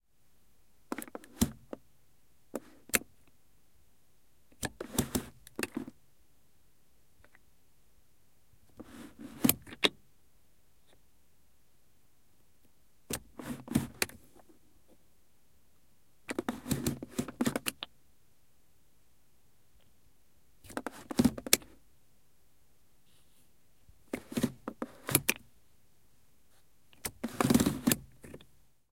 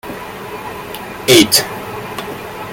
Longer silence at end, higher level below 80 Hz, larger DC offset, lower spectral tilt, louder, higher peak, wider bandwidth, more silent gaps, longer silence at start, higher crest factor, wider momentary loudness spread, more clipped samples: first, 0.55 s vs 0 s; second, -58 dBFS vs -46 dBFS; first, 0.1% vs under 0.1%; about the same, -3.5 dB/octave vs -2.5 dB/octave; second, -34 LUFS vs -13 LUFS; about the same, -2 dBFS vs 0 dBFS; about the same, 16.5 kHz vs 17.5 kHz; neither; first, 0.9 s vs 0.05 s; first, 36 dB vs 18 dB; about the same, 21 LU vs 19 LU; neither